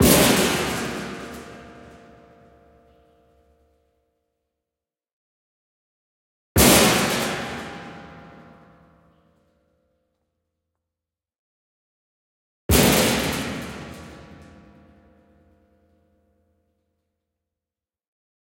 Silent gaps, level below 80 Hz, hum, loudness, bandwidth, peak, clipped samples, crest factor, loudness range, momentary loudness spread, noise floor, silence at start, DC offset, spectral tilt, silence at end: 5.13-6.55 s, 11.39-12.69 s; -42 dBFS; none; -19 LUFS; 16.5 kHz; -2 dBFS; under 0.1%; 24 dB; 18 LU; 26 LU; under -90 dBFS; 0 s; under 0.1%; -3.5 dB/octave; 4.25 s